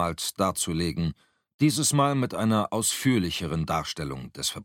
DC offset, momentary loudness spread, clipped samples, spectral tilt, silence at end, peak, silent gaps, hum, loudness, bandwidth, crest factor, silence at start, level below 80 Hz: under 0.1%; 9 LU; under 0.1%; -4.5 dB/octave; 0 s; -10 dBFS; 1.54-1.59 s; none; -26 LUFS; 17 kHz; 18 dB; 0 s; -50 dBFS